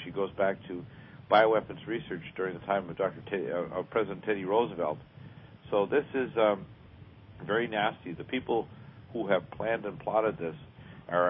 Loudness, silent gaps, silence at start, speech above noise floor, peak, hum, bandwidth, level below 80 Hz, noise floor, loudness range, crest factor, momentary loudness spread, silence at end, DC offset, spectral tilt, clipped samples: -31 LUFS; none; 0 s; 21 dB; -10 dBFS; none; 5.8 kHz; -62 dBFS; -52 dBFS; 3 LU; 22 dB; 20 LU; 0 s; under 0.1%; -9.5 dB/octave; under 0.1%